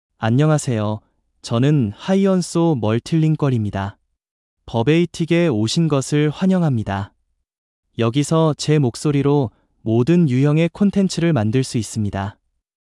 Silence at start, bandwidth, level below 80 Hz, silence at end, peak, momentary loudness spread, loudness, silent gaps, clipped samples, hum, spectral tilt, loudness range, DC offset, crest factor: 0.2 s; 12 kHz; -52 dBFS; 0.65 s; -4 dBFS; 10 LU; -18 LUFS; 4.31-4.57 s, 7.58-7.83 s; under 0.1%; none; -6.5 dB/octave; 2 LU; under 0.1%; 14 dB